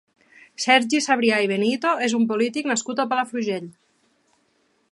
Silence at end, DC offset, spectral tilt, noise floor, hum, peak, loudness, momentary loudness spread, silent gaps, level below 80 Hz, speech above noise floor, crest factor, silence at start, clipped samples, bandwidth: 1.25 s; under 0.1%; -3 dB/octave; -66 dBFS; none; -4 dBFS; -21 LUFS; 9 LU; none; -76 dBFS; 45 dB; 20 dB; 0.6 s; under 0.1%; 11.5 kHz